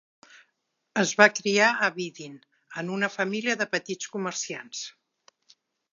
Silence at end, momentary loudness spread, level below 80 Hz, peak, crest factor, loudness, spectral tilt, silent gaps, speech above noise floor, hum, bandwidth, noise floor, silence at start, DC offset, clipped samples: 1 s; 18 LU; -84 dBFS; -2 dBFS; 26 dB; -25 LUFS; -3 dB/octave; none; 51 dB; none; 7.6 kHz; -77 dBFS; 0.95 s; under 0.1%; under 0.1%